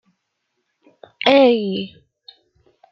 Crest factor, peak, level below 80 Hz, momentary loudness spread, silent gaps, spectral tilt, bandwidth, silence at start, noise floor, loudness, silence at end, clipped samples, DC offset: 20 dB; -2 dBFS; -68 dBFS; 16 LU; none; -6.5 dB/octave; 6.2 kHz; 1.25 s; -74 dBFS; -16 LUFS; 1.05 s; under 0.1%; under 0.1%